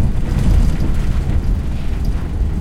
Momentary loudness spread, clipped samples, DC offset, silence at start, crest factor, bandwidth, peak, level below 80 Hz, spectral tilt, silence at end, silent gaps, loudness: 6 LU; under 0.1%; under 0.1%; 0 s; 12 dB; 12.5 kHz; -4 dBFS; -16 dBFS; -7.5 dB/octave; 0 s; none; -19 LUFS